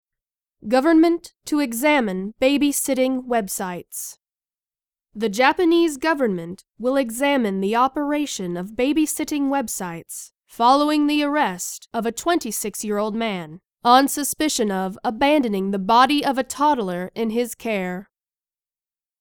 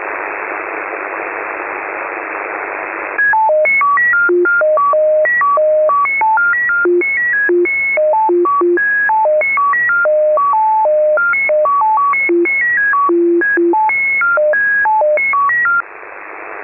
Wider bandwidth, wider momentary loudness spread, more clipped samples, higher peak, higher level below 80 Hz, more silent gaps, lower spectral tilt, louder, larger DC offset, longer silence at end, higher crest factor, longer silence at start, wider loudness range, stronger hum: first, 19.5 kHz vs 3 kHz; first, 13 LU vs 10 LU; neither; first, 0 dBFS vs -8 dBFS; about the same, -56 dBFS vs -56 dBFS; neither; second, -4 dB/octave vs -9.5 dB/octave; second, -21 LUFS vs -12 LUFS; neither; first, 1.15 s vs 0 s; first, 20 dB vs 6 dB; first, 0.65 s vs 0 s; about the same, 3 LU vs 3 LU; neither